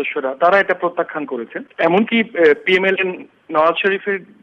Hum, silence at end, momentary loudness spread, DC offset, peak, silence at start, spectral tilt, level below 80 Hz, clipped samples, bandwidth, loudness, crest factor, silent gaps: none; 0.2 s; 11 LU; under 0.1%; -2 dBFS; 0 s; -6.5 dB/octave; -62 dBFS; under 0.1%; 7.4 kHz; -17 LUFS; 14 dB; none